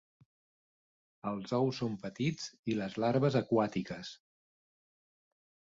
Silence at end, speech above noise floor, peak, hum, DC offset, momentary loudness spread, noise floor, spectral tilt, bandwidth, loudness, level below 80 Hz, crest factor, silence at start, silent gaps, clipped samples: 1.6 s; over 57 dB; -16 dBFS; none; under 0.1%; 13 LU; under -90 dBFS; -6.5 dB/octave; 7.8 kHz; -34 LUFS; -70 dBFS; 20 dB; 1.25 s; 2.59-2.63 s; under 0.1%